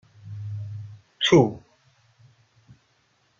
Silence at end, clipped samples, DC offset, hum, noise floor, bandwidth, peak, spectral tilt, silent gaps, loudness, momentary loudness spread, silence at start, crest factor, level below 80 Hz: 1.8 s; under 0.1%; under 0.1%; none; -66 dBFS; 7.6 kHz; -4 dBFS; -5.5 dB/octave; none; -22 LUFS; 25 LU; 0.25 s; 22 dB; -58 dBFS